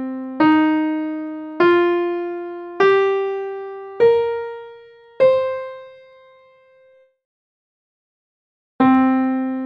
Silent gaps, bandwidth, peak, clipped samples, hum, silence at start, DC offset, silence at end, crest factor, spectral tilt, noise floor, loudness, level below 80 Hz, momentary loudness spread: 7.25-8.79 s; 6 kHz; -4 dBFS; under 0.1%; none; 0 s; under 0.1%; 0 s; 16 dB; -7 dB/octave; -53 dBFS; -18 LUFS; -64 dBFS; 16 LU